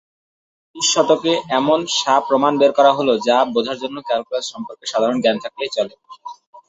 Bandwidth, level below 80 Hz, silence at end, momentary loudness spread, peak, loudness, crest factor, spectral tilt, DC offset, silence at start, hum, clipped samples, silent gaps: 8.2 kHz; -64 dBFS; 0.1 s; 13 LU; -2 dBFS; -17 LUFS; 16 dB; -3 dB/octave; under 0.1%; 0.75 s; none; under 0.1%; 6.47-6.53 s